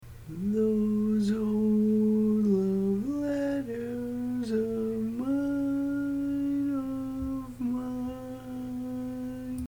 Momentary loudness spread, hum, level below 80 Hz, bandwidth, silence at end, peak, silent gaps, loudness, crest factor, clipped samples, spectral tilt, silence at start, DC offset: 11 LU; none; -52 dBFS; 19 kHz; 0 s; -16 dBFS; none; -29 LUFS; 14 dB; under 0.1%; -8.5 dB/octave; 0 s; under 0.1%